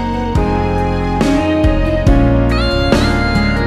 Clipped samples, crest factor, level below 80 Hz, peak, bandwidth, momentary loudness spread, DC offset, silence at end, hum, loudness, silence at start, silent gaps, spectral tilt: under 0.1%; 12 dB; -18 dBFS; 0 dBFS; 12.5 kHz; 4 LU; under 0.1%; 0 s; none; -14 LUFS; 0 s; none; -7 dB/octave